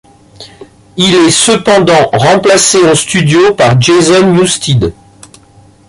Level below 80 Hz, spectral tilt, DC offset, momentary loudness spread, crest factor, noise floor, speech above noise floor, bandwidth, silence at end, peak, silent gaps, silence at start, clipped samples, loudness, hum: -38 dBFS; -4 dB/octave; under 0.1%; 5 LU; 8 dB; -41 dBFS; 34 dB; 11.5 kHz; 0.95 s; 0 dBFS; none; 0.4 s; under 0.1%; -7 LUFS; none